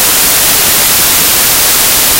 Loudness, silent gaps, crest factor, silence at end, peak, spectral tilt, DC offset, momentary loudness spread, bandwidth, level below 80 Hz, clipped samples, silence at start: -5 LUFS; none; 8 dB; 0 s; 0 dBFS; 0 dB/octave; under 0.1%; 0 LU; over 20 kHz; -32 dBFS; 1%; 0 s